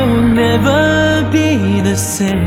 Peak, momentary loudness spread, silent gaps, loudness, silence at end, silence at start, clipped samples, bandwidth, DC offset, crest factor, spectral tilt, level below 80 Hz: 0 dBFS; 4 LU; none; -12 LUFS; 0 s; 0 s; under 0.1%; 16.5 kHz; under 0.1%; 12 dB; -5.5 dB/octave; -32 dBFS